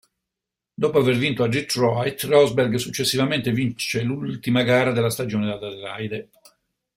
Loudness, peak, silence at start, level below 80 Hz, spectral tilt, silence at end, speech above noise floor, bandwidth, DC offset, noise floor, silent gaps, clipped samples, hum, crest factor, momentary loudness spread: -22 LUFS; -4 dBFS; 0.8 s; -58 dBFS; -5 dB/octave; 0.7 s; 64 dB; 16 kHz; under 0.1%; -86 dBFS; none; under 0.1%; none; 18 dB; 12 LU